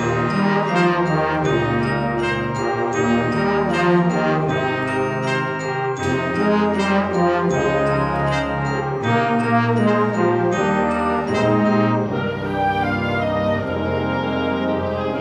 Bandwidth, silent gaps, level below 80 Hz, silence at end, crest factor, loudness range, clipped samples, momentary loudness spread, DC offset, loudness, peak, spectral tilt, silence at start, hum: 10 kHz; none; -44 dBFS; 0 s; 14 dB; 1 LU; under 0.1%; 5 LU; under 0.1%; -19 LUFS; -4 dBFS; -6.5 dB/octave; 0 s; none